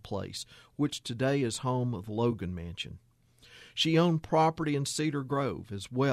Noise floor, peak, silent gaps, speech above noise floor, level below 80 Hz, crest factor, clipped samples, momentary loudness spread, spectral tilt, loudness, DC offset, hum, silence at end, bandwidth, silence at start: -58 dBFS; -12 dBFS; none; 28 dB; -60 dBFS; 18 dB; under 0.1%; 13 LU; -5.5 dB/octave; -31 LUFS; under 0.1%; none; 0 s; 14 kHz; 0.05 s